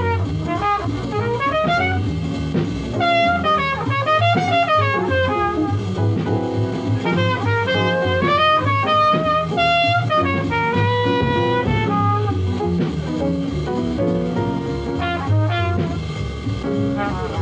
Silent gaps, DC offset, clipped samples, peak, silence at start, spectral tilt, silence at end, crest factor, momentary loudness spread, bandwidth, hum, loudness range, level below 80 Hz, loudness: none; under 0.1%; under 0.1%; -6 dBFS; 0 s; -7 dB/octave; 0 s; 14 dB; 7 LU; 8.4 kHz; none; 5 LU; -38 dBFS; -19 LUFS